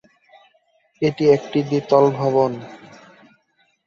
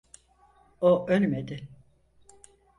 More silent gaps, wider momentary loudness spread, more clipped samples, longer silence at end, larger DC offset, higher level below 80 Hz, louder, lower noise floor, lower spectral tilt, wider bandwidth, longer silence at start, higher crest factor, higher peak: neither; second, 9 LU vs 19 LU; neither; about the same, 1.1 s vs 1.05 s; neither; about the same, -62 dBFS vs -62 dBFS; first, -18 LUFS vs -25 LUFS; about the same, -64 dBFS vs -61 dBFS; about the same, -7.5 dB/octave vs -7.5 dB/octave; second, 7.2 kHz vs 11 kHz; first, 1 s vs 0.8 s; about the same, 18 dB vs 18 dB; first, -2 dBFS vs -12 dBFS